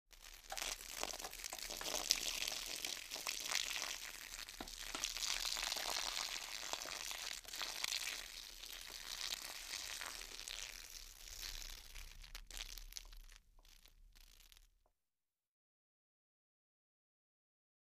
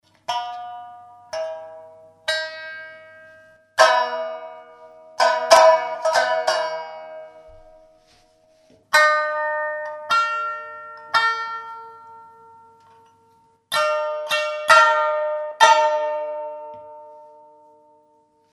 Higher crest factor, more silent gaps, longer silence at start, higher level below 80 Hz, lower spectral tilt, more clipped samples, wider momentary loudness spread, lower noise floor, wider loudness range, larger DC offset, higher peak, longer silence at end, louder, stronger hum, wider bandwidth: first, 40 dB vs 22 dB; neither; second, 0.1 s vs 0.3 s; first, -62 dBFS vs -68 dBFS; about the same, 1 dB/octave vs 0.5 dB/octave; neither; second, 14 LU vs 23 LU; first, under -90 dBFS vs -60 dBFS; first, 13 LU vs 9 LU; neither; second, -8 dBFS vs 0 dBFS; first, 3.3 s vs 1.3 s; second, -43 LUFS vs -19 LUFS; neither; first, 15.5 kHz vs 13.5 kHz